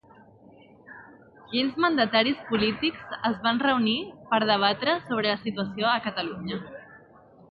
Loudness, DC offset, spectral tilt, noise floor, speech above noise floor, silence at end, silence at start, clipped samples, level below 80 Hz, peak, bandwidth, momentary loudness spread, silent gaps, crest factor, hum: -25 LUFS; under 0.1%; -7.5 dB/octave; -53 dBFS; 28 dB; 0.55 s; 0.9 s; under 0.1%; -62 dBFS; -6 dBFS; 5.2 kHz; 12 LU; none; 20 dB; none